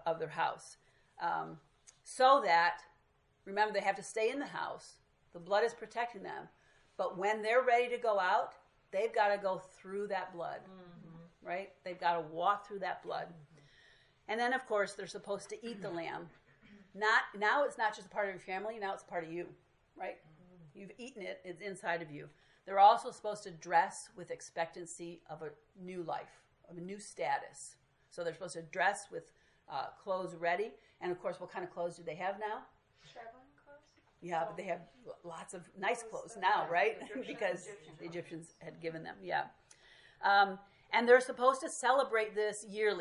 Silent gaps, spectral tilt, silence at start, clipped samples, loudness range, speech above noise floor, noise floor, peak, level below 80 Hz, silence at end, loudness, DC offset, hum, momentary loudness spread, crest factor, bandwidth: none; -3.5 dB/octave; 0 s; under 0.1%; 10 LU; 37 dB; -72 dBFS; -12 dBFS; -78 dBFS; 0 s; -35 LUFS; under 0.1%; none; 20 LU; 24 dB; 11.5 kHz